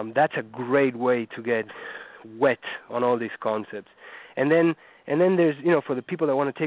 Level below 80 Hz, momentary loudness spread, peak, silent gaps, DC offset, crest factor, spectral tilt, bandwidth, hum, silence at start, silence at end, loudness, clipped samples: -74 dBFS; 17 LU; -8 dBFS; none; under 0.1%; 16 dB; -10.5 dB/octave; 4 kHz; none; 0 s; 0 s; -24 LUFS; under 0.1%